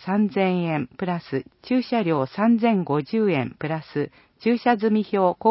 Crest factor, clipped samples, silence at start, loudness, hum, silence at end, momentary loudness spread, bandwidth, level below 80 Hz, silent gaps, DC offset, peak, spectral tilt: 16 dB; under 0.1%; 0 s; -23 LUFS; none; 0 s; 9 LU; 5.8 kHz; -64 dBFS; none; under 0.1%; -6 dBFS; -11.5 dB/octave